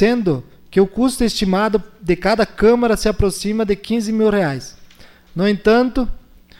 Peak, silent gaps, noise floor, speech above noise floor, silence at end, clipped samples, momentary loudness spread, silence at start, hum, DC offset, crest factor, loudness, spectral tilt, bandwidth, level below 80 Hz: -4 dBFS; none; -44 dBFS; 28 dB; 0.45 s; under 0.1%; 8 LU; 0 s; none; under 0.1%; 14 dB; -17 LUFS; -5.5 dB/octave; 16.5 kHz; -32 dBFS